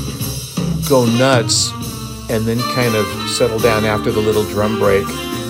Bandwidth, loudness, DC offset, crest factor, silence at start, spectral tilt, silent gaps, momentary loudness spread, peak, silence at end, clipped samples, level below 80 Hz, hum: 16.5 kHz; -16 LUFS; under 0.1%; 16 dB; 0 s; -4.5 dB/octave; none; 9 LU; 0 dBFS; 0 s; under 0.1%; -36 dBFS; none